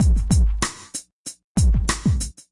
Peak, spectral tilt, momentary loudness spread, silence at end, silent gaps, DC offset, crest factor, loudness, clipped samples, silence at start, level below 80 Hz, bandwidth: -6 dBFS; -5 dB/octave; 14 LU; 0.2 s; 1.12-1.25 s, 1.44-1.55 s; under 0.1%; 14 dB; -22 LUFS; under 0.1%; 0 s; -22 dBFS; 11.5 kHz